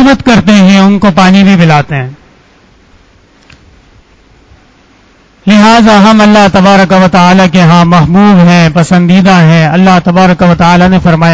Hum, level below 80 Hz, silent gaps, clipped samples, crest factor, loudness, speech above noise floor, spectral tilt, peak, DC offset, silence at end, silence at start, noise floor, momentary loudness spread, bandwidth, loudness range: none; -32 dBFS; none; 9%; 4 dB; -4 LUFS; 39 dB; -6.5 dB/octave; 0 dBFS; under 0.1%; 0 s; 0 s; -42 dBFS; 4 LU; 8 kHz; 9 LU